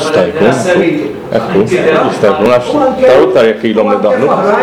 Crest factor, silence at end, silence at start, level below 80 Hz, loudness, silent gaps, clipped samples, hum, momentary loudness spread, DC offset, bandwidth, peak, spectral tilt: 8 dB; 0 s; 0 s; -42 dBFS; -9 LUFS; none; under 0.1%; none; 5 LU; under 0.1%; 13.5 kHz; 0 dBFS; -6 dB/octave